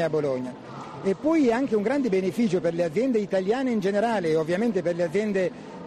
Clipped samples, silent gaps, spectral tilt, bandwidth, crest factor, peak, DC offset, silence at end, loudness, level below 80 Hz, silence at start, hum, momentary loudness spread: under 0.1%; none; -7 dB/octave; 13 kHz; 12 dB; -12 dBFS; under 0.1%; 0 s; -25 LUFS; -62 dBFS; 0 s; none; 7 LU